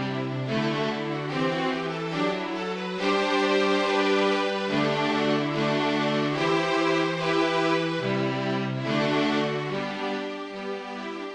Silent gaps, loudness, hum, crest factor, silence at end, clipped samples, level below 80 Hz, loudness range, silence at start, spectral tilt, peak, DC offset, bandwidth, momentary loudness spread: none; -26 LUFS; none; 14 dB; 0 s; under 0.1%; -64 dBFS; 3 LU; 0 s; -5.5 dB/octave; -12 dBFS; under 0.1%; 10.5 kHz; 7 LU